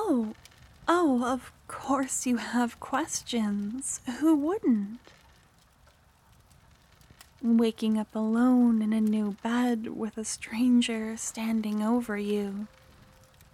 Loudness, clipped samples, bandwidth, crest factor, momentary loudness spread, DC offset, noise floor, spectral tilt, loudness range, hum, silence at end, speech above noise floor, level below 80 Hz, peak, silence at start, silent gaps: -28 LUFS; under 0.1%; 14.5 kHz; 18 dB; 11 LU; under 0.1%; -61 dBFS; -4.5 dB/octave; 5 LU; none; 0.85 s; 33 dB; -62 dBFS; -10 dBFS; 0 s; none